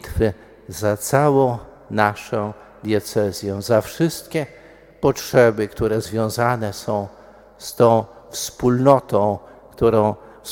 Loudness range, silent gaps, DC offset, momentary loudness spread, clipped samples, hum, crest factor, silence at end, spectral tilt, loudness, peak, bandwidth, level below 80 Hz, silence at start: 3 LU; none; under 0.1%; 15 LU; under 0.1%; none; 20 dB; 0 s; -6 dB/octave; -20 LUFS; 0 dBFS; 17.5 kHz; -44 dBFS; 0.05 s